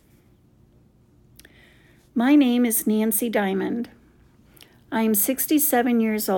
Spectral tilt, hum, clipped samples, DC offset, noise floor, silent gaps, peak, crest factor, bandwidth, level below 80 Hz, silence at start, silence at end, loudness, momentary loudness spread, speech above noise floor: -4 dB/octave; none; under 0.1%; under 0.1%; -56 dBFS; none; -8 dBFS; 16 dB; 18 kHz; -62 dBFS; 2.15 s; 0 s; -21 LUFS; 12 LU; 36 dB